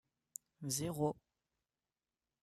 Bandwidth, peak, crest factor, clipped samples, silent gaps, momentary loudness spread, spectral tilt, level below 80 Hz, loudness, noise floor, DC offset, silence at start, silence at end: 14.5 kHz; -22 dBFS; 22 dB; under 0.1%; none; 16 LU; -5 dB/octave; -72 dBFS; -40 LUFS; under -90 dBFS; under 0.1%; 0.6 s; 1.3 s